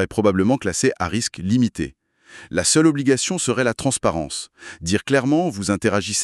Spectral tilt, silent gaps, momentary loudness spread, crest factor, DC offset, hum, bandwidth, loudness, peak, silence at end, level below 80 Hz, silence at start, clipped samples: -4 dB/octave; none; 11 LU; 18 dB; under 0.1%; none; 13.5 kHz; -20 LUFS; -2 dBFS; 0 s; -48 dBFS; 0 s; under 0.1%